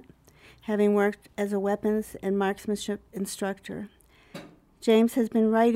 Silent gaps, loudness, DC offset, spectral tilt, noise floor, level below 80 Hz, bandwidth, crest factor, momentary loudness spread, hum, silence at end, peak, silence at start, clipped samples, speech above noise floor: none; -27 LUFS; under 0.1%; -5.5 dB/octave; -55 dBFS; -62 dBFS; 16 kHz; 16 dB; 20 LU; none; 0 s; -10 dBFS; 0.65 s; under 0.1%; 30 dB